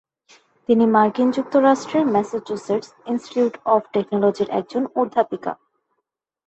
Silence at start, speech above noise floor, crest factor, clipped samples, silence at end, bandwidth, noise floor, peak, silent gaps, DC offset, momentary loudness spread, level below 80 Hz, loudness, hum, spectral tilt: 0.7 s; 59 dB; 18 dB; under 0.1%; 0.95 s; 8.4 kHz; -78 dBFS; -2 dBFS; none; under 0.1%; 11 LU; -66 dBFS; -20 LUFS; none; -6.5 dB/octave